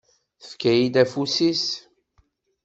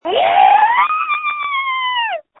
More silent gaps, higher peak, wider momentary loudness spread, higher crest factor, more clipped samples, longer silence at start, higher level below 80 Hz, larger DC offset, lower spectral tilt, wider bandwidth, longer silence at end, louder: neither; second, -4 dBFS vs 0 dBFS; first, 11 LU vs 8 LU; first, 20 dB vs 14 dB; neither; first, 0.45 s vs 0.05 s; about the same, -62 dBFS vs -62 dBFS; neither; about the same, -4.5 dB/octave vs -5 dB/octave; first, 8 kHz vs 4.1 kHz; first, 0.85 s vs 0.2 s; second, -21 LUFS vs -14 LUFS